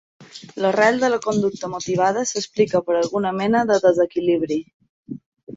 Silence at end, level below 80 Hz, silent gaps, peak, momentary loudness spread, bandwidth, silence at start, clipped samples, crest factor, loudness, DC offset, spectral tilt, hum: 0 s; -62 dBFS; 4.74-4.80 s, 4.89-5.03 s, 5.26-5.32 s; -4 dBFS; 20 LU; 8 kHz; 0.2 s; under 0.1%; 18 dB; -20 LUFS; under 0.1%; -4.5 dB/octave; none